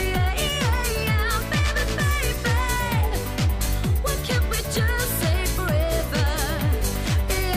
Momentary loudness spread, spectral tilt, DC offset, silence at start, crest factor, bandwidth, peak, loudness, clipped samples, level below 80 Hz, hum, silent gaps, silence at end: 2 LU; -4.5 dB/octave; under 0.1%; 0 s; 10 dB; 15.5 kHz; -12 dBFS; -23 LUFS; under 0.1%; -26 dBFS; none; none; 0 s